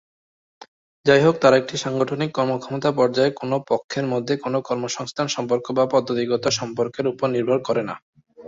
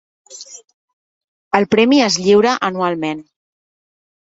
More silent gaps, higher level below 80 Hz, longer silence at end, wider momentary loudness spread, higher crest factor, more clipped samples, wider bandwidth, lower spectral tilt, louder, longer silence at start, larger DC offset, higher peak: second, 0.68-1.04 s, 3.84-3.89 s, 8.02-8.13 s vs 0.74-1.51 s; about the same, -62 dBFS vs -58 dBFS; second, 0 s vs 1.1 s; second, 9 LU vs 22 LU; about the same, 20 dB vs 18 dB; neither; about the same, 7.8 kHz vs 8 kHz; about the same, -5 dB/octave vs -4 dB/octave; second, -21 LUFS vs -15 LUFS; first, 0.6 s vs 0.3 s; neither; about the same, -2 dBFS vs 0 dBFS